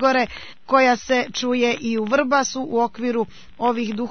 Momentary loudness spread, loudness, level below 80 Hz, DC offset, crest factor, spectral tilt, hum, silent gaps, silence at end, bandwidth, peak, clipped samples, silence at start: 8 LU; -21 LUFS; -54 dBFS; 0.7%; 18 dB; -3.5 dB/octave; none; none; 0 s; 6.6 kHz; -4 dBFS; under 0.1%; 0 s